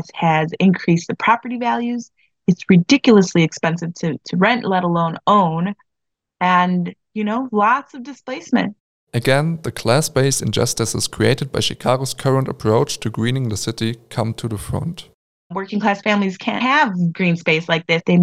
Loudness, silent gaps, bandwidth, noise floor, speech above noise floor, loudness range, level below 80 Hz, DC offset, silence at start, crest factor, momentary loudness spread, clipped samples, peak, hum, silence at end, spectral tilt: -18 LUFS; 8.80-9.07 s, 15.14-15.50 s; 15 kHz; -80 dBFS; 62 dB; 5 LU; -50 dBFS; under 0.1%; 0 s; 18 dB; 10 LU; under 0.1%; 0 dBFS; none; 0 s; -5 dB/octave